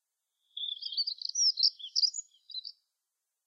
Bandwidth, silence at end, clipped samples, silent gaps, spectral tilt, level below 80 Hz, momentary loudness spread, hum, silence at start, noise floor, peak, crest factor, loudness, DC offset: 7.6 kHz; 0.75 s; under 0.1%; none; 10.5 dB/octave; under -90 dBFS; 17 LU; none; 0.55 s; -87 dBFS; -14 dBFS; 20 dB; -29 LUFS; under 0.1%